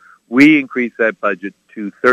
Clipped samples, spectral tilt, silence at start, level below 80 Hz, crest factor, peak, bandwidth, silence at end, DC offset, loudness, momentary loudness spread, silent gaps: 0.1%; -6 dB/octave; 0.3 s; -60 dBFS; 14 dB; 0 dBFS; 10 kHz; 0 s; under 0.1%; -14 LUFS; 19 LU; none